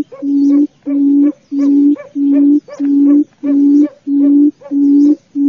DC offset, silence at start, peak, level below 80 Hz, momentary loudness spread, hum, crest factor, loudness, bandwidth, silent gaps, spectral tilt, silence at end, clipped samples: under 0.1%; 0 s; -2 dBFS; -66 dBFS; 5 LU; none; 8 dB; -11 LUFS; 2.5 kHz; none; -8 dB/octave; 0 s; under 0.1%